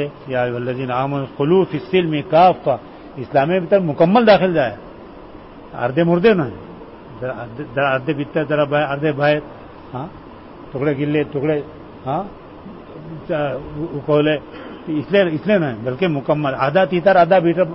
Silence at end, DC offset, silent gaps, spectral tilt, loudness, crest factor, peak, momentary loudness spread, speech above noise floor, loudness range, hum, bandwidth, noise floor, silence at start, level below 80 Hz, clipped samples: 0 s; 0.1%; none; -11 dB/octave; -18 LUFS; 16 dB; -2 dBFS; 22 LU; 21 dB; 7 LU; none; 5.8 kHz; -38 dBFS; 0 s; -50 dBFS; under 0.1%